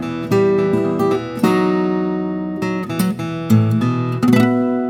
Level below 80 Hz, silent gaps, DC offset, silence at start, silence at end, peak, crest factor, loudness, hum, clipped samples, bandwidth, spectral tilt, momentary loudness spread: -52 dBFS; none; under 0.1%; 0 s; 0 s; 0 dBFS; 16 dB; -17 LUFS; none; under 0.1%; 17.5 kHz; -7.5 dB/octave; 8 LU